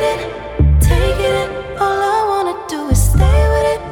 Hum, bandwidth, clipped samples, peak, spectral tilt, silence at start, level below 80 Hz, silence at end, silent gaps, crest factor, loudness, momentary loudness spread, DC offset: none; 17.5 kHz; under 0.1%; 0 dBFS; -5.5 dB/octave; 0 s; -18 dBFS; 0 s; none; 14 dB; -15 LUFS; 9 LU; under 0.1%